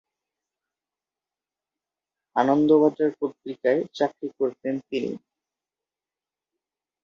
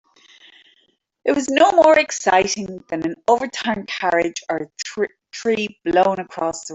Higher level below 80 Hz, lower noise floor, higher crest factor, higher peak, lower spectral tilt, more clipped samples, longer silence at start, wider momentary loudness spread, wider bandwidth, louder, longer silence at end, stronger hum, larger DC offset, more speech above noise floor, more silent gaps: second, -74 dBFS vs -58 dBFS; first, under -90 dBFS vs -62 dBFS; about the same, 20 dB vs 18 dB; second, -6 dBFS vs -2 dBFS; first, -7 dB/octave vs -3.5 dB/octave; neither; first, 2.35 s vs 1.25 s; about the same, 13 LU vs 12 LU; second, 7 kHz vs 8.2 kHz; second, -24 LUFS vs -19 LUFS; first, 1.85 s vs 0 s; neither; neither; first, over 67 dB vs 43 dB; neither